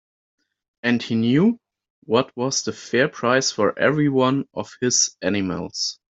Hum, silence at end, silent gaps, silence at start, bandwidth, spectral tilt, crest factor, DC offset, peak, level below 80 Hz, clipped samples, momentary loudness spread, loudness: none; 0.2 s; 1.90-2.02 s; 0.85 s; 8 kHz; -4 dB/octave; 18 dB; under 0.1%; -4 dBFS; -62 dBFS; under 0.1%; 7 LU; -21 LUFS